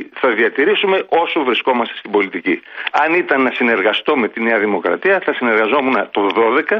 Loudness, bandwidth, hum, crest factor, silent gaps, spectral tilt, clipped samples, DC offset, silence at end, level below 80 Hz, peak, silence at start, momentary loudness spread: -15 LUFS; 6.4 kHz; none; 14 dB; none; -6 dB/octave; under 0.1%; under 0.1%; 0 s; -66 dBFS; -2 dBFS; 0 s; 4 LU